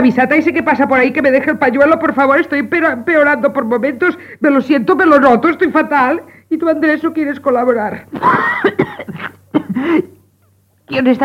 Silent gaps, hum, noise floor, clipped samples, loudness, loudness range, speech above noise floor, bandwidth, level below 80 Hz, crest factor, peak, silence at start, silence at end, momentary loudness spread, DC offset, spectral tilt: none; none; -54 dBFS; 0.1%; -13 LUFS; 4 LU; 42 dB; 14.5 kHz; -54 dBFS; 12 dB; 0 dBFS; 0 s; 0 s; 9 LU; under 0.1%; -7 dB/octave